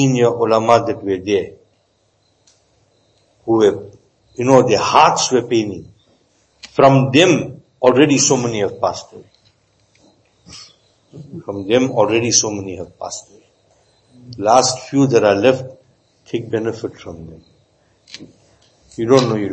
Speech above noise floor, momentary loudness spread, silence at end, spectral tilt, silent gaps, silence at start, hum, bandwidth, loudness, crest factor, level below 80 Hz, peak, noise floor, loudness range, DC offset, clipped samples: 46 dB; 22 LU; 0 s; -4.5 dB/octave; none; 0 s; none; 8.8 kHz; -15 LUFS; 18 dB; -56 dBFS; 0 dBFS; -61 dBFS; 8 LU; under 0.1%; under 0.1%